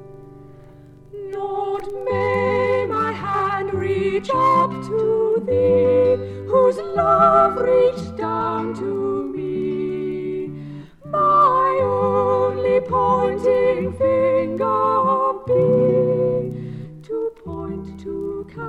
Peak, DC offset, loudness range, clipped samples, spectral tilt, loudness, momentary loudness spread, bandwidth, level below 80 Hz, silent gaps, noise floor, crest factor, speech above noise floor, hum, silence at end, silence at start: -4 dBFS; under 0.1%; 5 LU; under 0.1%; -8 dB/octave; -19 LUFS; 13 LU; 8.6 kHz; -50 dBFS; none; -44 dBFS; 16 dB; 26 dB; none; 0 s; 0 s